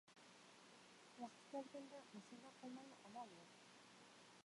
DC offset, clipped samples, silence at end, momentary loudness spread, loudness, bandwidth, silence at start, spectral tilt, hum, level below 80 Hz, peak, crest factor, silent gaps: under 0.1%; under 0.1%; 0.05 s; 11 LU; -59 LUFS; 11.5 kHz; 0.05 s; -4 dB/octave; none; under -90 dBFS; -40 dBFS; 20 dB; none